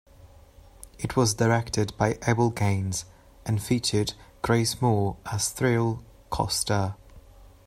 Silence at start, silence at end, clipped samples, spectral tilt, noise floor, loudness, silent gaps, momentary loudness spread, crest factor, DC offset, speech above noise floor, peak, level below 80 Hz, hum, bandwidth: 0.2 s; 0.2 s; under 0.1%; -5 dB/octave; -51 dBFS; -26 LUFS; none; 10 LU; 20 dB; under 0.1%; 26 dB; -8 dBFS; -48 dBFS; none; 15.5 kHz